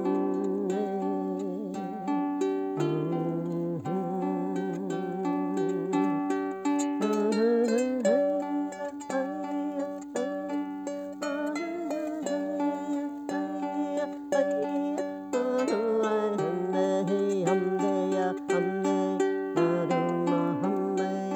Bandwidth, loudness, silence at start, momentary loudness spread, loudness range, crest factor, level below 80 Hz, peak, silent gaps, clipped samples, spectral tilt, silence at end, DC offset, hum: 9 kHz; -29 LUFS; 0 s; 7 LU; 5 LU; 16 dB; -76 dBFS; -14 dBFS; none; under 0.1%; -6.5 dB/octave; 0 s; under 0.1%; none